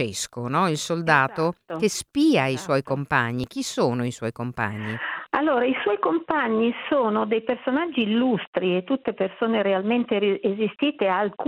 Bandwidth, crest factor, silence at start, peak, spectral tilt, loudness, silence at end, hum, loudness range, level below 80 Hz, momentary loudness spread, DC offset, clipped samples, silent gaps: 15.5 kHz; 20 dB; 0 s; -4 dBFS; -5 dB/octave; -24 LUFS; 0 s; none; 2 LU; -60 dBFS; 8 LU; under 0.1%; under 0.1%; 8.47-8.53 s